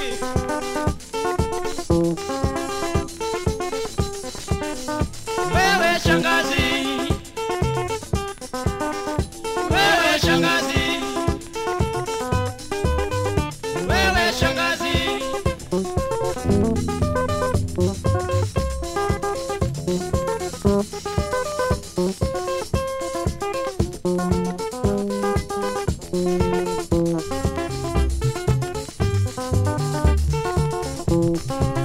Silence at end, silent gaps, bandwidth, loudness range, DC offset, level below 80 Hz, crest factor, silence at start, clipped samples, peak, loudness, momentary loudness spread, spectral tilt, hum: 0 s; none; 16 kHz; 4 LU; under 0.1%; -32 dBFS; 20 dB; 0 s; under 0.1%; -2 dBFS; -23 LUFS; 8 LU; -5 dB/octave; none